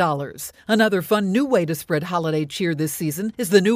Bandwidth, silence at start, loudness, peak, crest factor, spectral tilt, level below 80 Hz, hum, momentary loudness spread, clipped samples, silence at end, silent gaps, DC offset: 16 kHz; 0 s; -21 LUFS; -2 dBFS; 18 dB; -5 dB/octave; -60 dBFS; none; 7 LU; under 0.1%; 0 s; none; under 0.1%